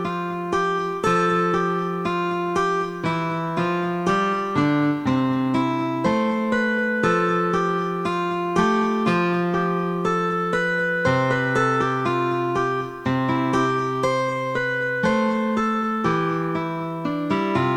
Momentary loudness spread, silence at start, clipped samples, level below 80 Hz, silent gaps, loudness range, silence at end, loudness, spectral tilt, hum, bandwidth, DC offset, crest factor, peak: 4 LU; 0 s; under 0.1%; -54 dBFS; none; 1 LU; 0 s; -22 LUFS; -6.5 dB/octave; none; 12 kHz; under 0.1%; 16 dB; -6 dBFS